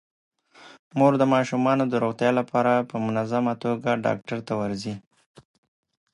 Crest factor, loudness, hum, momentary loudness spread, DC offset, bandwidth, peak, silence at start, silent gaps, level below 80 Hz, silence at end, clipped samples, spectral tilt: 18 dB; -24 LUFS; none; 9 LU; under 0.1%; 11 kHz; -6 dBFS; 0.6 s; 0.79-0.91 s; -66 dBFS; 1.15 s; under 0.1%; -7 dB/octave